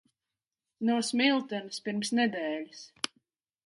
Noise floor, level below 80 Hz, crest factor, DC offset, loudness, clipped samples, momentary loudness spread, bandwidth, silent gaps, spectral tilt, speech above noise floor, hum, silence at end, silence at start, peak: under -90 dBFS; -80 dBFS; 22 dB; under 0.1%; -30 LUFS; under 0.1%; 11 LU; 11.5 kHz; none; -3.5 dB/octave; over 60 dB; none; 0.8 s; 0.8 s; -10 dBFS